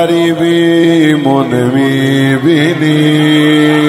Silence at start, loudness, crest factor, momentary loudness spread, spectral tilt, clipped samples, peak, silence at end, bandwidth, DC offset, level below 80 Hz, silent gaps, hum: 0 s; -9 LUFS; 8 dB; 3 LU; -6.5 dB/octave; 0.4%; 0 dBFS; 0 s; 15.5 kHz; under 0.1%; -52 dBFS; none; none